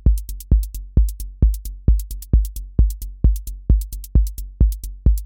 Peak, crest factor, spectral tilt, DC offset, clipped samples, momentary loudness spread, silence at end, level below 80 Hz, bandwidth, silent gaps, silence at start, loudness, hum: -4 dBFS; 14 dB; -8 dB/octave; under 0.1%; under 0.1%; 3 LU; 0 s; -18 dBFS; 17 kHz; none; 0.05 s; -22 LUFS; none